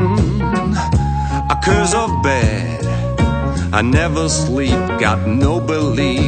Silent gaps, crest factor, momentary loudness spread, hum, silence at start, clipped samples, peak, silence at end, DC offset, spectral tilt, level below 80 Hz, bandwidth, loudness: none; 16 dB; 4 LU; none; 0 s; under 0.1%; 0 dBFS; 0 s; under 0.1%; -5.5 dB/octave; -24 dBFS; 9.2 kHz; -16 LUFS